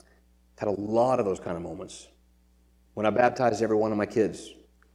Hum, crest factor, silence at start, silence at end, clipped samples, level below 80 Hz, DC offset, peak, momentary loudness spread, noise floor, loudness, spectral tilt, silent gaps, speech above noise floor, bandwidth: none; 20 dB; 0.6 s; 0.4 s; under 0.1%; -60 dBFS; under 0.1%; -8 dBFS; 19 LU; -62 dBFS; -26 LUFS; -6 dB/octave; none; 35 dB; 11.5 kHz